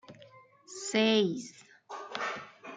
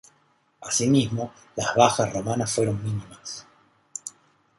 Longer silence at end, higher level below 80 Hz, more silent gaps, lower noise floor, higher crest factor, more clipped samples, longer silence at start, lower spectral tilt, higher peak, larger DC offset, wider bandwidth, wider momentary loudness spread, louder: second, 0 s vs 0.5 s; second, -82 dBFS vs -56 dBFS; neither; second, -57 dBFS vs -65 dBFS; second, 18 dB vs 24 dB; neither; second, 0.1 s vs 0.6 s; about the same, -4 dB/octave vs -4.5 dB/octave; second, -14 dBFS vs -2 dBFS; neither; second, 9.6 kHz vs 11.5 kHz; first, 21 LU vs 18 LU; second, -31 LUFS vs -24 LUFS